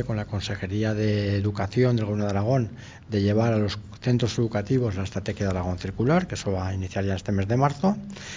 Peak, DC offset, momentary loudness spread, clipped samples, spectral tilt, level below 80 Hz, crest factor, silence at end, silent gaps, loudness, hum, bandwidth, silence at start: -6 dBFS; under 0.1%; 7 LU; under 0.1%; -7 dB/octave; -42 dBFS; 18 dB; 0 s; none; -26 LUFS; none; 7.6 kHz; 0 s